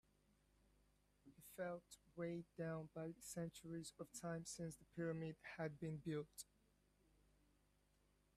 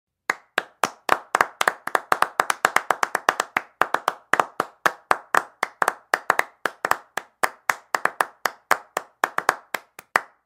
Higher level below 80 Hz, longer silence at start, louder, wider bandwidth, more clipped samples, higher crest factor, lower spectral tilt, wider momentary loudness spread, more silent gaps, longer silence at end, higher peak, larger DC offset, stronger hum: second, -78 dBFS vs -64 dBFS; first, 1.25 s vs 0.3 s; second, -51 LUFS vs -24 LUFS; about the same, 15.5 kHz vs 17 kHz; neither; second, 18 dB vs 24 dB; first, -5.5 dB/octave vs -1 dB/octave; about the same, 8 LU vs 7 LU; neither; first, 1.95 s vs 0.2 s; second, -36 dBFS vs 0 dBFS; neither; first, 50 Hz at -75 dBFS vs none